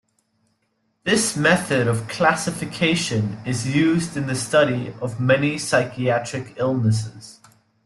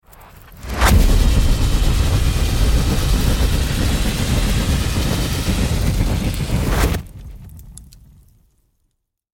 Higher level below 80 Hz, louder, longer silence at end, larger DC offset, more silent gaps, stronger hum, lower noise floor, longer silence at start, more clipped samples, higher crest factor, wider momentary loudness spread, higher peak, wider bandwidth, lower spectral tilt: second, -56 dBFS vs -20 dBFS; about the same, -21 LUFS vs -19 LUFS; second, 0.55 s vs 1.5 s; neither; neither; neither; about the same, -70 dBFS vs -70 dBFS; first, 1.05 s vs 0.1 s; neither; about the same, 18 dB vs 14 dB; second, 8 LU vs 13 LU; about the same, -4 dBFS vs -4 dBFS; second, 12.5 kHz vs 17 kHz; about the same, -5 dB/octave vs -5 dB/octave